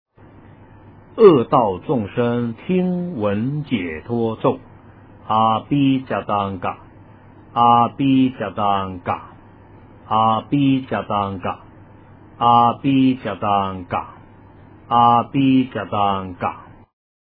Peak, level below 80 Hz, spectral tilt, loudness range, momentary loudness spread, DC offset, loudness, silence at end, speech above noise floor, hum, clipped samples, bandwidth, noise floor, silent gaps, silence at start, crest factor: 0 dBFS; -52 dBFS; -11 dB/octave; 4 LU; 12 LU; under 0.1%; -19 LUFS; 0.65 s; 27 dB; none; under 0.1%; 4.7 kHz; -45 dBFS; none; 1.15 s; 20 dB